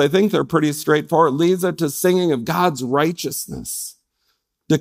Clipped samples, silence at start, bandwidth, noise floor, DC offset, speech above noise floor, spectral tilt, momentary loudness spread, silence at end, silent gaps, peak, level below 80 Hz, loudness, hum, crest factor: under 0.1%; 0 s; 16 kHz; -70 dBFS; under 0.1%; 51 dB; -5 dB/octave; 10 LU; 0 s; none; -2 dBFS; -54 dBFS; -19 LUFS; none; 18 dB